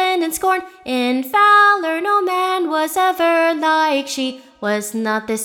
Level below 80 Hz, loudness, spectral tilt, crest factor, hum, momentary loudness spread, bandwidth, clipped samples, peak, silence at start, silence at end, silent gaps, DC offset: -60 dBFS; -17 LUFS; -2.5 dB/octave; 14 dB; none; 11 LU; 19.5 kHz; under 0.1%; -2 dBFS; 0 s; 0 s; none; under 0.1%